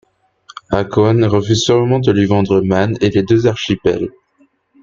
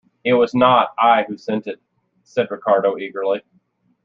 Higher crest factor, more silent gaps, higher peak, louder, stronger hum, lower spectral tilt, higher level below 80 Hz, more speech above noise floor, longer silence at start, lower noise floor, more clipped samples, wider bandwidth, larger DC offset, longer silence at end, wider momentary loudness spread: about the same, 14 dB vs 18 dB; neither; about the same, -2 dBFS vs -2 dBFS; first, -14 LUFS vs -18 LUFS; neither; about the same, -6.5 dB/octave vs -6.5 dB/octave; first, -44 dBFS vs -64 dBFS; about the same, 43 dB vs 44 dB; first, 0.7 s vs 0.25 s; second, -56 dBFS vs -61 dBFS; neither; about the same, 7.6 kHz vs 7.2 kHz; neither; about the same, 0.75 s vs 0.65 s; second, 6 LU vs 12 LU